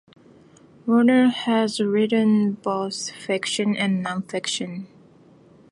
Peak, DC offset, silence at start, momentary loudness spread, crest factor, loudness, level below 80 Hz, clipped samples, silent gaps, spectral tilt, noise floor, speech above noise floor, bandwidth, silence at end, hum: -6 dBFS; under 0.1%; 0.85 s; 11 LU; 18 dB; -22 LUFS; -72 dBFS; under 0.1%; none; -5 dB/octave; -52 dBFS; 30 dB; 11.5 kHz; 0.85 s; none